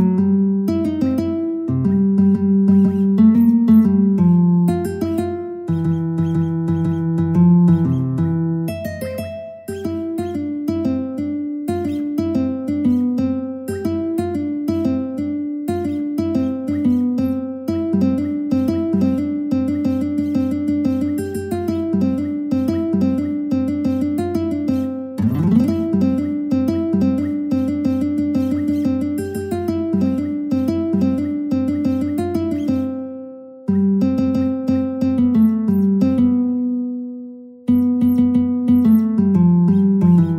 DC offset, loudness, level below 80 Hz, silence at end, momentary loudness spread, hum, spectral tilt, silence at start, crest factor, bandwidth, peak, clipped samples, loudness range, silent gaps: under 0.1%; -18 LUFS; -50 dBFS; 0 s; 10 LU; none; -9.5 dB/octave; 0 s; 14 dB; 15.5 kHz; -2 dBFS; under 0.1%; 6 LU; none